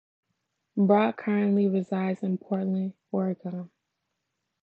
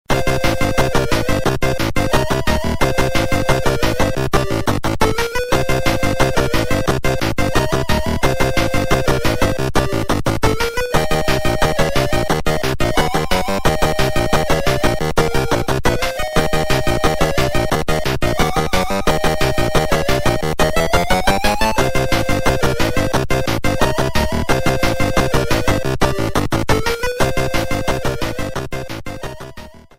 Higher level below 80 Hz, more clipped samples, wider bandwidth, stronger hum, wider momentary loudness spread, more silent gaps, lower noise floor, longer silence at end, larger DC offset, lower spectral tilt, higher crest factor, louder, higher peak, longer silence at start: second, -80 dBFS vs -24 dBFS; neither; second, 4.3 kHz vs 16.5 kHz; neither; first, 13 LU vs 3 LU; neither; first, -81 dBFS vs -36 dBFS; first, 0.95 s vs 0.2 s; neither; first, -10 dB/octave vs -5 dB/octave; about the same, 18 dB vs 16 dB; second, -27 LUFS vs -18 LUFS; second, -10 dBFS vs 0 dBFS; first, 0.75 s vs 0.1 s